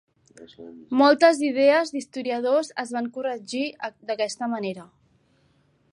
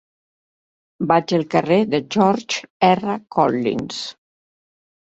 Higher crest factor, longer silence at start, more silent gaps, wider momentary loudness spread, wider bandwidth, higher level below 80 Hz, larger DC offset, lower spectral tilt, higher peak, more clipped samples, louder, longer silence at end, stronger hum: about the same, 20 dB vs 18 dB; second, 0.4 s vs 1 s; second, none vs 2.70-2.80 s; first, 16 LU vs 10 LU; first, 11 kHz vs 8.2 kHz; second, -76 dBFS vs -60 dBFS; neither; second, -4 dB/octave vs -5.5 dB/octave; second, -6 dBFS vs -2 dBFS; neither; second, -23 LUFS vs -19 LUFS; first, 1.1 s vs 0.9 s; neither